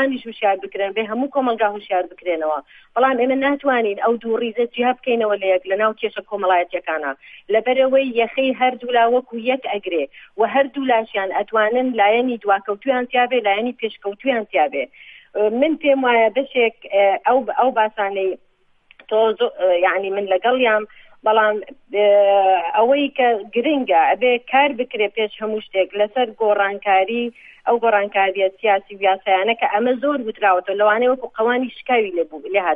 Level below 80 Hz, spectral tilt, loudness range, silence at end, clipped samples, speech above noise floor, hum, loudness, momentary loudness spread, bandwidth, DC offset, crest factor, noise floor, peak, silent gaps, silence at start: -64 dBFS; -7 dB/octave; 3 LU; 0 s; under 0.1%; 37 dB; none; -19 LUFS; 7 LU; 3.9 kHz; under 0.1%; 16 dB; -55 dBFS; -2 dBFS; none; 0 s